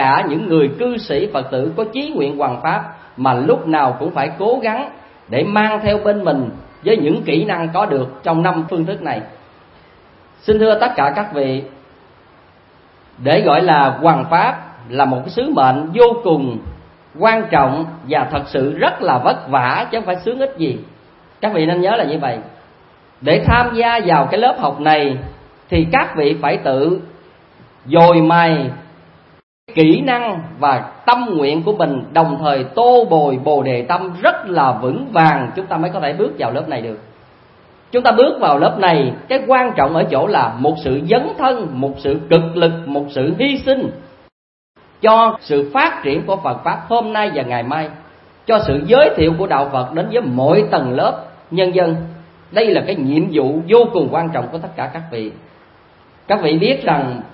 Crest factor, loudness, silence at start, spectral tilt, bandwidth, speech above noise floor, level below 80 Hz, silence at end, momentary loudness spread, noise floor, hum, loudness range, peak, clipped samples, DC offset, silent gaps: 16 dB; -15 LUFS; 0 s; -9.5 dB/octave; 5.8 kHz; 33 dB; -42 dBFS; 0.1 s; 10 LU; -47 dBFS; none; 4 LU; 0 dBFS; under 0.1%; under 0.1%; 29.43-29.67 s, 44.32-44.74 s